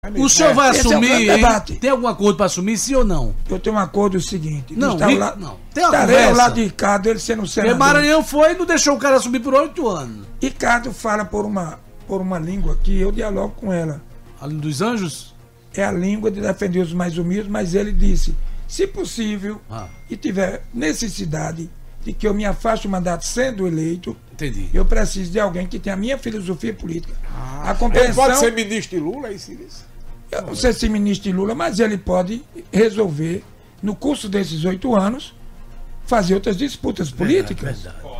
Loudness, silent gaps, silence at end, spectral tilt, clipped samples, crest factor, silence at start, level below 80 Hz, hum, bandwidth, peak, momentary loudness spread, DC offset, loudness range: -18 LUFS; none; 0 s; -4.5 dB/octave; under 0.1%; 16 dB; 0.05 s; -26 dBFS; none; 15.5 kHz; -2 dBFS; 16 LU; under 0.1%; 9 LU